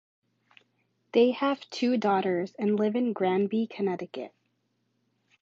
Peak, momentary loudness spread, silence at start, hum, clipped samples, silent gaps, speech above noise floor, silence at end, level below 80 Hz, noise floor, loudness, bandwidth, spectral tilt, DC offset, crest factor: -10 dBFS; 10 LU; 1.15 s; none; under 0.1%; none; 49 dB; 1.15 s; -80 dBFS; -75 dBFS; -27 LUFS; 7.6 kHz; -6.5 dB/octave; under 0.1%; 20 dB